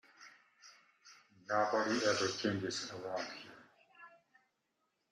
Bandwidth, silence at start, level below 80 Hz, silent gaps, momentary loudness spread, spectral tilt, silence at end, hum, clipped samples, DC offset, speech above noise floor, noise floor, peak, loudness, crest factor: 13 kHz; 0.2 s; -82 dBFS; none; 25 LU; -3.5 dB/octave; 1.05 s; none; under 0.1%; under 0.1%; 47 dB; -83 dBFS; -18 dBFS; -36 LUFS; 22 dB